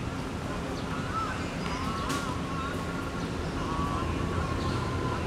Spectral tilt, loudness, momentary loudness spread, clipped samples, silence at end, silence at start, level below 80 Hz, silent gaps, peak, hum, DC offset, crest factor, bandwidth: -5.5 dB/octave; -32 LUFS; 3 LU; under 0.1%; 0 s; 0 s; -42 dBFS; none; -16 dBFS; none; under 0.1%; 14 dB; 15.5 kHz